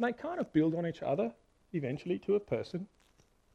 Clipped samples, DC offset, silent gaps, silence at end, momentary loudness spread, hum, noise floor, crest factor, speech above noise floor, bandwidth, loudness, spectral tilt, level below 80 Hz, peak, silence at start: under 0.1%; under 0.1%; none; 0.7 s; 11 LU; none; -68 dBFS; 18 dB; 34 dB; 8.4 kHz; -35 LUFS; -8.5 dB/octave; -68 dBFS; -16 dBFS; 0 s